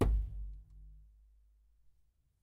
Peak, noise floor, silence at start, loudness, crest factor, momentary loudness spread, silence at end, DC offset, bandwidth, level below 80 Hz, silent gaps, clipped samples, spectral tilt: -18 dBFS; -73 dBFS; 0 s; -40 LUFS; 20 dB; 24 LU; 1.45 s; under 0.1%; 4.7 kHz; -40 dBFS; none; under 0.1%; -8 dB/octave